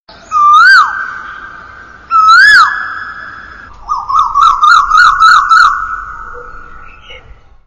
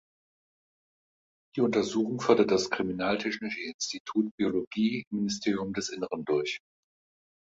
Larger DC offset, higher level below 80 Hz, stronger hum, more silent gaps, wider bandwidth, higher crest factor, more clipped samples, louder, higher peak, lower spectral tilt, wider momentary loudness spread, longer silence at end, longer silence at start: first, 0.2% vs under 0.1%; first, -36 dBFS vs -66 dBFS; neither; second, none vs 3.74-3.79 s, 4.00-4.05 s, 4.31-4.38 s, 4.67-4.71 s, 5.07-5.11 s; first, 12 kHz vs 8 kHz; second, 10 dB vs 22 dB; neither; first, -5 LUFS vs -29 LUFS; first, 0 dBFS vs -8 dBFS; second, 0.5 dB/octave vs -4.5 dB/octave; first, 23 LU vs 9 LU; second, 0.5 s vs 0.9 s; second, 0.3 s vs 1.55 s